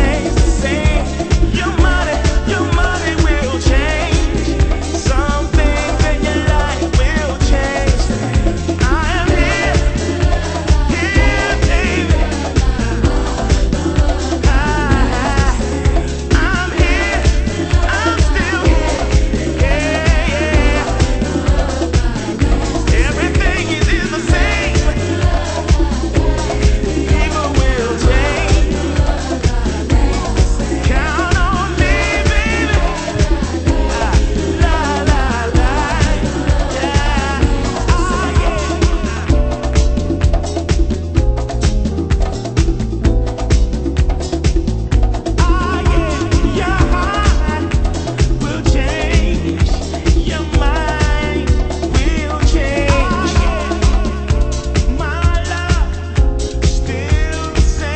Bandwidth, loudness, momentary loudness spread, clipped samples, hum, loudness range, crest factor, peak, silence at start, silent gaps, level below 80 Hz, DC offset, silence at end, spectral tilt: 8.8 kHz; -16 LUFS; 3 LU; under 0.1%; none; 2 LU; 14 dB; 0 dBFS; 0 s; none; -16 dBFS; under 0.1%; 0 s; -5.5 dB/octave